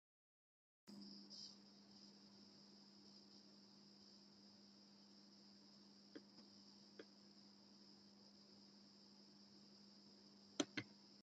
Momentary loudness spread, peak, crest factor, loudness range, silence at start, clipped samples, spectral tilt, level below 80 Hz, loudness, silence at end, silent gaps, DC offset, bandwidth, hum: 11 LU; -26 dBFS; 34 dB; 9 LU; 0.85 s; under 0.1%; -2.5 dB/octave; under -90 dBFS; -60 LUFS; 0 s; none; under 0.1%; 7.6 kHz; none